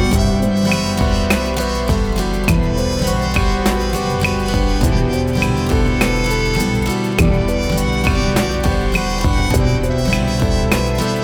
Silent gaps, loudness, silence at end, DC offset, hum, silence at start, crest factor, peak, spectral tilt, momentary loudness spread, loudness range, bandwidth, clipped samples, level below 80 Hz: none; -17 LUFS; 0 s; under 0.1%; none; 0 s; 14 dB; -2 dBFS; -5.5 dB/octave; 2 LU; 1 LU; 20 kHz; under 0.1%; -20 dBFS